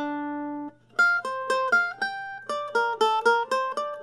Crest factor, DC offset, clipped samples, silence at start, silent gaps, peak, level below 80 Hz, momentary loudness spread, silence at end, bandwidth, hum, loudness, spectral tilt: 18 dB; under 0.1%; under 0.1%; 0 s; none; -8 dBFS; -76 dBFS; 11 LU; 0 s; 13 kHz; none; -25 LUFS; -2.5 dB/octave